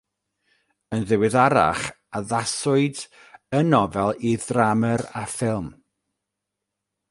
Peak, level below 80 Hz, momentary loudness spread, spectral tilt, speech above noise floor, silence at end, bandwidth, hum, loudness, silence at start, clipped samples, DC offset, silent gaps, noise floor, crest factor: -2 dBFS; -54 dBFS; 12 LU; -5.5 dB/octave; 61 dB; 1.4 s; 11.5 kHz; none; -22 LUFS; 0.9 s; under 0.1%; under 0.1%; none; -83 dBFS; 20 dB